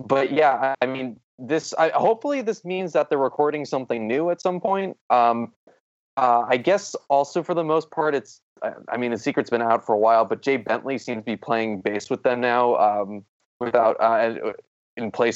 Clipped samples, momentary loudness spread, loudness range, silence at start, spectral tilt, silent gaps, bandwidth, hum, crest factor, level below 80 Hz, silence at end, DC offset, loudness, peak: under 0.1%; 12 LU; 1 LU; 0 s; -5 dB/octave; 1.24-1.38 s, 5.01-5.10 s, 5.56-5.67 s, 5.80-6.17 s, 8.42-8.56 s, 13.29-13.60 s, 14.67-14.97 s; 8 kHz; none; 18 dB; -76 dBFS; 0 s; under 0.1%; -22 LUFS; -4 dBFS